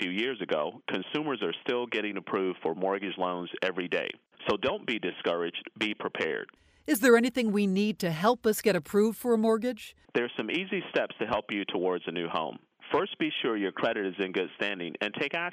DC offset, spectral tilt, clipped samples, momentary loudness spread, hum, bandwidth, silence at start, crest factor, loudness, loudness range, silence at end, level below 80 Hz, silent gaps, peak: under 0.1%; -4.5 dB/octave; under 0.1%; 7 LU; none; 15.5 kHz; 0 s; 20 dB; -30 LUFS; 5 LU; 0 s; -68 dBFS; none; -10 dBFS